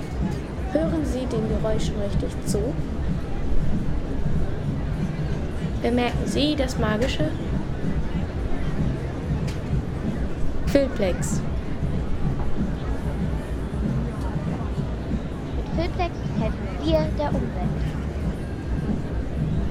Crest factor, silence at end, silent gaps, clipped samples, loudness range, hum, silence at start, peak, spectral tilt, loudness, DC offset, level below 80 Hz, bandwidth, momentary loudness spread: 20 dB; 0 s; none; under 0.1%; 3 LU; none; 0 s; -4 dBFS; -6.5 dB/octave; -26 LUFS; under 0.1%; -30 dBFS; 13 kHz; 6 LU